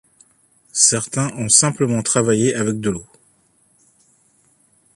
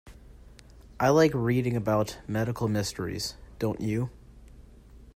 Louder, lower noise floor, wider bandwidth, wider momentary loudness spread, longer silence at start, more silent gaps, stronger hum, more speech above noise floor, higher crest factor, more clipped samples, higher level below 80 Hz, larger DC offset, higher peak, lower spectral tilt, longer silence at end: first, -16 LUFS vs -28 LUFS; first, -59 dBFS vs -51 dBFS; second, 12.5 kHz vs 16 kHz; about the same, 11 LU vs 11 LU; first, 0.75 s vs 0.05 s; neither; neither; first, 41 dB vs 24 dB; about the same, 20 dB vs 20 dB; neither; about the same, -54 dBFS vs -50 dBFS; neither; first, 0 dBFS vs -10 dBFS; second, -3.5 dB/octave vs -6 dB/octave; first, 1.9 s vs 0.05 s